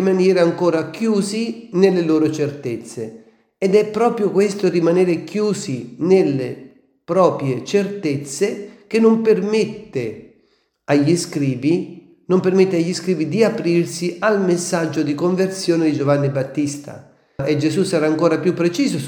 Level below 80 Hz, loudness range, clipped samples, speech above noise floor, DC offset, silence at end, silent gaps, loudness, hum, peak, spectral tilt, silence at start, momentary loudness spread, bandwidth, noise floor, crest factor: -64 dBFS; 2 LU; under 0.1%; 44 dB; under 0.1%; 0 s; none; -18 LUFS; none; 0 dBFS; -6 dB/octave; 0 s; 11 LU; 18 kHz; -61 dBFS; 18 dB